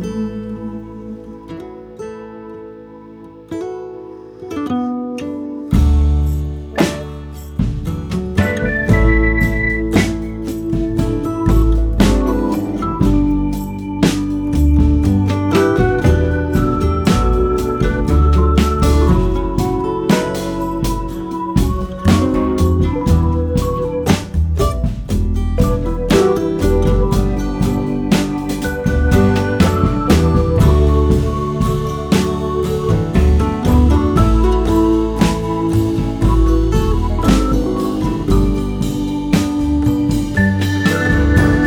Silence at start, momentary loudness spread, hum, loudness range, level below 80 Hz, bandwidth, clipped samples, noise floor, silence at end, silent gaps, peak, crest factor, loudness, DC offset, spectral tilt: 0 s; 12 LU; none; 5 LU; -20 dBFS; 18 kHz; under 0.1%; -36 dBFS; 0 s; none; 0 dBFS; 14 dB; -16 LUFS; under 0.1%; -7 dB/octave